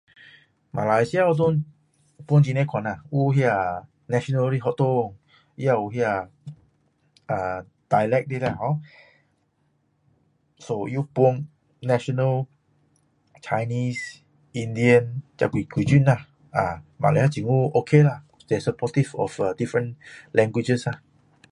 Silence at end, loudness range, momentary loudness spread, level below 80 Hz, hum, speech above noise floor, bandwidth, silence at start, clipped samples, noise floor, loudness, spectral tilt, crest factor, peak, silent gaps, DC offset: 0.55 s; 6 LU; 14 LU; -56 dBFS; none; 46 dB; 10.5 kHz; 0.75 s; under 0.1%; -68 dBFS; -23 LUFS; -7.5 dB/octave; 22 dB; -2 dBFS; none; under 0.1%